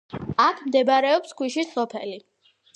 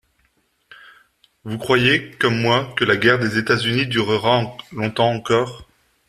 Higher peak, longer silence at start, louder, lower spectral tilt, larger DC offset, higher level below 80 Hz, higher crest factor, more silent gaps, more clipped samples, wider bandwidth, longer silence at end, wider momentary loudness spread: second, -6 dBFS vs -2 dBFS; second, 0.15 s vs 1.45 s; second, -22 LUFS vs -18 LUFS; about the same, -4.5 dB/octave vs -5.5 dB/octave; neither; about the same, -58 dBFS vs -54 dBFS; about the same, 18 dB vs 18 dB; neither; neither; second, 9.8 kHz vs 13.5 kHz; about the same, 0.55 s vs 0.45 s; about the same, 14 LU vs 12 LU